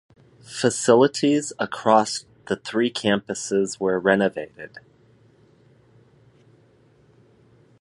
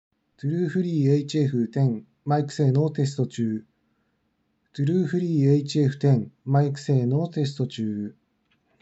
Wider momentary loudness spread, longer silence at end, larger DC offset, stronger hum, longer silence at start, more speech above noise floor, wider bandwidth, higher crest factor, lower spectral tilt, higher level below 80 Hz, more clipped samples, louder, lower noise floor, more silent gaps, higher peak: first, 16 LU vs 8 LU; first, 3 s vs 0.7 s; neither; neither; about the same, 0.5 s vs 0.45 s; second, 35 dB vs 49 dB; first, 11.5 kHz vs 8 kHz; first, 22 dB vs 16 dB; second, -4 dB/octave vs -8 dB/octave; first, -64 dBFS vs -78 dBFS; neither; about the same, -22 LUFS vs -24 LUFS; second, -57 dBFS vs -72 dBFS; neither; first, -2 dBFS vs -8 dBFS